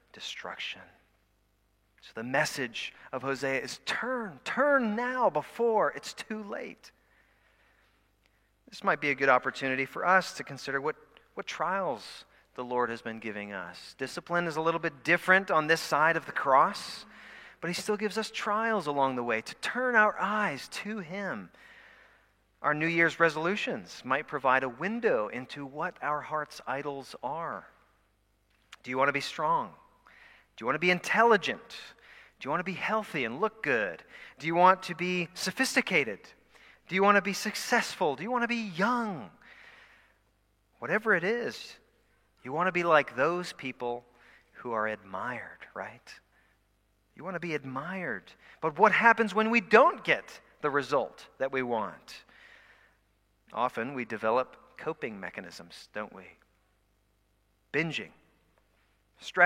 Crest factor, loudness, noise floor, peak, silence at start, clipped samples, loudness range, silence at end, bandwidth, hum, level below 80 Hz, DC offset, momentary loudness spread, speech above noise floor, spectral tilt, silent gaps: 26 dB; -29 LUFS; -71 dBFS; -4 dBFS; 0.15 s; under 0.1%; 10 LU; 0 s; 16 kHz; none; -72 dBFS; under 0.1%; 18 LU; 41 dB; -4 dB/octave; none